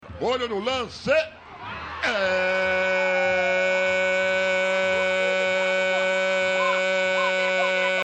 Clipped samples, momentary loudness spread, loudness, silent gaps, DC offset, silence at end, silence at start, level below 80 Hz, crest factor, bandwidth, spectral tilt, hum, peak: under 0.1%; 6 LU; -22 LUFS; none; under 0.1%; 0 s; 0 s; -56 dBFS; 12 dB; 9 kHz; -3 dB/octave; none; -10 dBFS